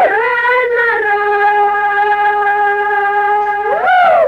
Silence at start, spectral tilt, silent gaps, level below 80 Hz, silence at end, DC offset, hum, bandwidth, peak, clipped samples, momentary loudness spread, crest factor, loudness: 0 s; -3.5 dB/octave; none; -52 dBFS; 0 s; under 0.1%; none; 6.2 kHz; -2 dBFS; under 0.1%; 2 LU; 10 dB; -12 LUFS